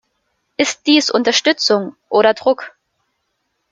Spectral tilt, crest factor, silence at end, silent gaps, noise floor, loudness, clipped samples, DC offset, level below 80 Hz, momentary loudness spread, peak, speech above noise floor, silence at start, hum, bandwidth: -2.5 dB/octave; 16 dB; 1.05 s; none; -70 dBFS; -15 LUFS; under 0.1%; under 0.1%; -64 dBFS; 8 LU; 0 dBFS; 55 dB; 0.6 s; none; 9.4 kHz